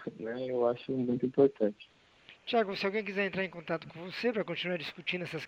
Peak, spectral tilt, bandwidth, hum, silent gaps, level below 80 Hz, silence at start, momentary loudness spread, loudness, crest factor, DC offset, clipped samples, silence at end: -14 dBFS; -6.5 dB/octave; 8.8 kHz; none; none; -74 dBFS; 0 s; 10 LU; -33 LUFS; 20 dB; under 0.1%; under 0.1%; 0 s